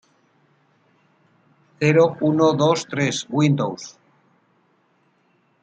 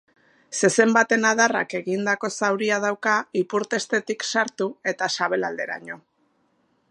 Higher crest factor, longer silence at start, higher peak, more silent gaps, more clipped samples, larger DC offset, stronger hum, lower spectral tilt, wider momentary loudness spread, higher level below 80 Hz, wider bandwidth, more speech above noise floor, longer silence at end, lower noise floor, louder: about the same, 20 dB vs 20 dB; first, 1.8 s vs 0.5 s; about the same, -4 dBFS vs -2 dBFS; neither; neither; neither; neither; first, -6 dB/octave vs -3 dB/octave; about the same, 10 LU vs 11 LU; first, -66 dBFS vs -78 dBFS; second, 9.2 kHz vs 11.5 kHz; about the same, 44 dB vs 44 dB; first, 1.75 s vs 0.95 s; second, -63 dBFS vs -67 dBFS; first, -19 LUFS vs -22 LUFS